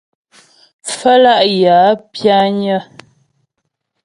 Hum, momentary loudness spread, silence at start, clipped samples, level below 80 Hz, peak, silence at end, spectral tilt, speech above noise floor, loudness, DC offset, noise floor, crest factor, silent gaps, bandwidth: none; 11 LU; 0.85 s; under 0.1%; -60 dBFS; 0 dBFS; 1.2 s; -4.5 dB/octave; 61 dB; -11 LUFS; under 0.1%; -72 dBFS; 14 dB; none; 11.5 kHz